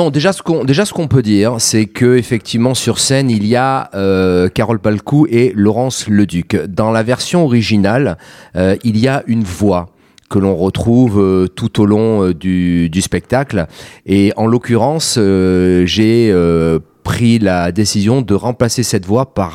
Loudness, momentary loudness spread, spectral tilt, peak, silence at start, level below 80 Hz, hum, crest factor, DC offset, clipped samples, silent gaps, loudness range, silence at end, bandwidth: -13 LUFS; 5 LU; -5.5 dB/octave; 0 dBFS; 0 s; -40 dBFS; none; 12 dB; under 0.1%; under 0.1%; none; 2 LU; 0 s; 15.5 kHz